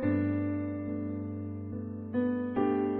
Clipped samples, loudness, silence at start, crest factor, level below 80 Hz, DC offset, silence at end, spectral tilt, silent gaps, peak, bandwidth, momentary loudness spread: under 0.1%; -33 LUFS; 0 s; 16 dB; -64 dBFS; under 0.1%; 0 s; -9 dB/octave; none; -16 dBFS; 4 kHz; 9 LU